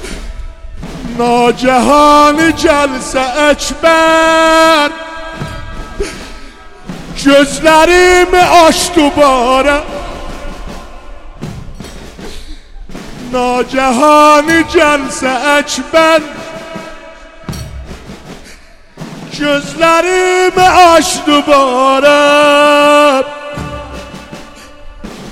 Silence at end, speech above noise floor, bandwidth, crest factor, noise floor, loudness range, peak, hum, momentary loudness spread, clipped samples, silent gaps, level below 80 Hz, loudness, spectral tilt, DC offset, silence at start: 0 s; 28 dB; 16.5 kHz; 10 dB; -35 dBFS; 11 LU; 0 dBFS; none; 23 LU; under 0.1%; none; -30 dBFS; -8 LUFS; -3.5 dB/octave; under 0.1%; 0 s